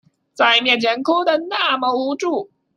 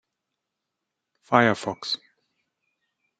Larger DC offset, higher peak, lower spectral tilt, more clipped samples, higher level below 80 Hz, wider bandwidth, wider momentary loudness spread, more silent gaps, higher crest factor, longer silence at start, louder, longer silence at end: neither; about the same, -2 dBFS vs -2 dBFS; second, -2.5 dB/octave vs -5 dB/octave; neither; about the same, -72 dBFS vs -72 dBFS; first, 13 kHz vs 9.2 kHz; about the same, 8 LU vs 10 LU; neither; second, 18 dB vs 26 dB; second, 0.4 s vs 1.3 s; first, -17 LUFS vs -24 LUFS; second, 0.3 s vs 1.25 s